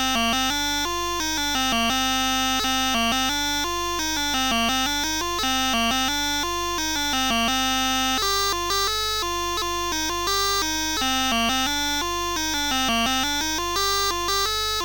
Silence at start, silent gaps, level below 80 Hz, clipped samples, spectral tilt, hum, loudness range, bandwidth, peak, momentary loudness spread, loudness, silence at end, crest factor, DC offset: 0 s; none; -40 dBFS; under 0.1%; -1 dB/octave; 50 Hz at -50 dBFS; 1 LU; 17 kHz; -10 dBFS; 3 LU; -22 LUFS; 0 s; 14 dB; 0.6%